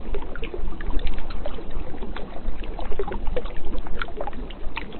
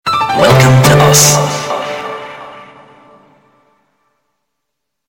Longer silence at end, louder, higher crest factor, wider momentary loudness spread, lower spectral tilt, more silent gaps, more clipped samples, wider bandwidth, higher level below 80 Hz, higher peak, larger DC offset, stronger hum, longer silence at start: second, 0 s vs 2.45 s; second, -34 LUFS vs -9 LUFS; about the same, 12 dB vs 12 dB; second, 5 LU vs 20 LU; first, -9.5 dB/octave vs -4 dB/octave; neither; neither; second, 4.3 kHz vs 19 kHz; first, -28 dBFS vs -40 dBFS; second, -6 dBFS vs 0 dBFS; neither; neither; about the same, 0 s vs 0.05 s